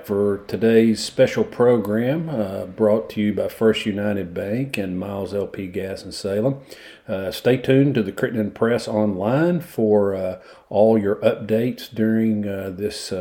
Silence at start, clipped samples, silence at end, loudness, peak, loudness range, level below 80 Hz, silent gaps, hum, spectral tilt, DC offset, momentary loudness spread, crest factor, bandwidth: 0 s; under 0.1%; 0 s; -21 LUFS; -4 dBFS; 5 LU; -56 dBFS; none; none; -6.5 dB/octave; under 0.1%; 11 LU; 16 dB; 17 kHz